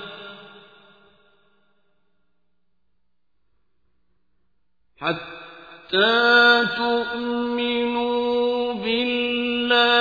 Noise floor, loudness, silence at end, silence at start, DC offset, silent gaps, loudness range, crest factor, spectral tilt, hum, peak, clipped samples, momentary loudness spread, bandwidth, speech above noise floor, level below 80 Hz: -77 dBFS; -20 LUFS; 0 s; 0 s; under 0.1%; none; 16 LU; 20 dB; -5 dB/octave; none; -4 dBFS; under 0.1%; 22 LU; 5 kHz; 57 dB; -62 dBFS